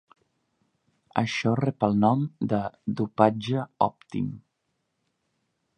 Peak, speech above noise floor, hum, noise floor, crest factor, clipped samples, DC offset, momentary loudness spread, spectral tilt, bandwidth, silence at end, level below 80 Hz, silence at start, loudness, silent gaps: -2 dBFS; 52 dB; none; -77 dBFS; 24 dB; under 0.1%; under 0.1%; 10 LU; -7 dB/octave; 9.6 kHz; 1.4 s; -62 dBFS; 1.15 s; -26 LUFS; none